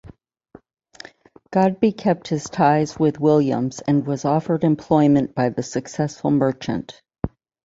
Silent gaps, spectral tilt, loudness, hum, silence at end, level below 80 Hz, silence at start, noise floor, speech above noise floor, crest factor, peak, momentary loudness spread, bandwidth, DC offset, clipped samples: none; -7 dB/octave; -20 LUFS; none; 0.35 s; -50 dBFS; 0.05 s; -50 dBFS; 31 dB; 18 dB; -2 dBFS; 14 LU; 7.8 kHz; under 0.1%; under 0.1%